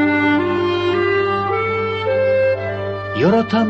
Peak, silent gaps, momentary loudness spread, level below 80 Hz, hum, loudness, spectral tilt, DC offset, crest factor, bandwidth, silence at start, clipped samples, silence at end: -2 dBFS; none; 6 LU; -44 dBFS; none; -17 LUFS; -7.5 dB/octave; under 0.1%; 14 dB; 7.8 kHz; 0 s; under 0.1%; 0 s